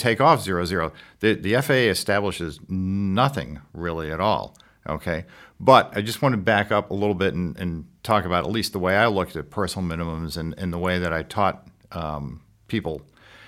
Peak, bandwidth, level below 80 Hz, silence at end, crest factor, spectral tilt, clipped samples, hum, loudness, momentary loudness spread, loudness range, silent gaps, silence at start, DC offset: 0 dBFS; 16.5 kHz; -46 dBFS; 0 s; 22 dB; -5.5 dB/octave; under 0.1%; none; -23 LUFS; 14 LU; 5 LU; none; 0 s; under 0.1%